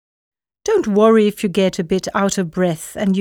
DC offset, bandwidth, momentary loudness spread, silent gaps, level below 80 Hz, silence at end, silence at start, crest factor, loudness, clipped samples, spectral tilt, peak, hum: under 0.1%; 17 kHz; 8 LU; none; -50 dBFS; 0 s; 0.65 s; 16 dB; -17 LUFS; under 0.1%; -5.5 dB/octave; -2 dBFS; none